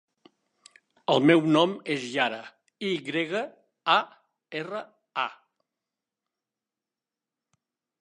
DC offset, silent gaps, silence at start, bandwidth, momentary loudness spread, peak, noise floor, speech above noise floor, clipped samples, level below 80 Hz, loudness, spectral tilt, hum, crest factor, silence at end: under 0.1%; none; 1.1 s; 10.5 kHz; 17 LU; -6 dBFS; -90 dBFS; 65 dB; under 0.1%; -82 dBFS; -26 LUFS; -5.5 dB/octave; none; 22 dB; 2.7 s